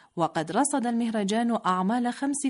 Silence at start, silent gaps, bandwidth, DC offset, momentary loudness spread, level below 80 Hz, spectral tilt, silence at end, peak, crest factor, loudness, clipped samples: 0.15 s; none; 11 kHz; under 0.1%; 3 LU; -72 dBFS; -4.5 dB/octave; 0 s; -12 dBFS; 14 dB; -26 LUFS; under 0.1%